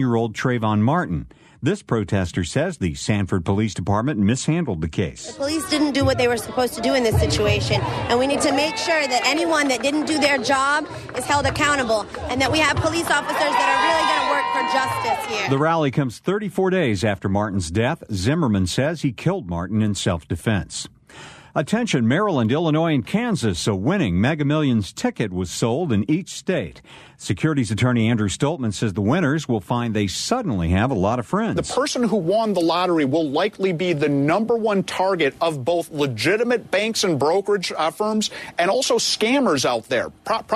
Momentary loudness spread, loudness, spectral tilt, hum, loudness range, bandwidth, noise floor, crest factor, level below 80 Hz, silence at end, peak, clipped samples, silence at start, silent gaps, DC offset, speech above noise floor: 6 LU; -21 LUFS; -5 dB/octave; none; 3 LU; 13.5 kHz; -42 dBFS; 16 dB; -44 dBFS; 0 s; -4 dBFS; under 0.1%; 0 s; none; under 0.1%; 22 dB